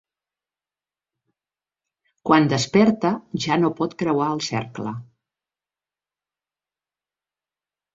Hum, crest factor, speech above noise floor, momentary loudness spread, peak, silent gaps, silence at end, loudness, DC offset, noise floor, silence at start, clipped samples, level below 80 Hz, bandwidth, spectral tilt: 50 Hz at -50 dBFS; 22 dB; over 70 dB; 14 LU; -2 dBFS; none; 2.9 s; -21 LUFS; under 0.1%; under -90 dBFS; 2.25 s; under 0.1%; -62 dBFS; 8 kHz; -5.5 dB/octave